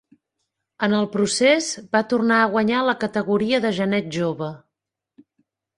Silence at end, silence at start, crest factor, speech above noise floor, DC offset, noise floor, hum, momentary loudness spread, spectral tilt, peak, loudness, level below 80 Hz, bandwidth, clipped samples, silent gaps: 1.2 s; 0.8 s; 18 dB; 64 dB; under 0.1%; -84 dBFS; none; 8 LU; -4.5 dB/octave; -4 dBFS; -20 LUFS; -62 dBFS; 11 kHz; under 0.1%; none